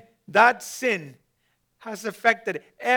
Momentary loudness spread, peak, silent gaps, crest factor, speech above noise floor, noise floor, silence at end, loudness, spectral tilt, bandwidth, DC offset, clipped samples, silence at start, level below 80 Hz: 15 LU; -4 dBFS; none; 22 dB; 48 dB; -71 dBFS; 0 s; -23 LUFS; -3 dB/octave; over 20 kHz; under 0.1%; under 0.1%; 0.3 s; -78 dBFS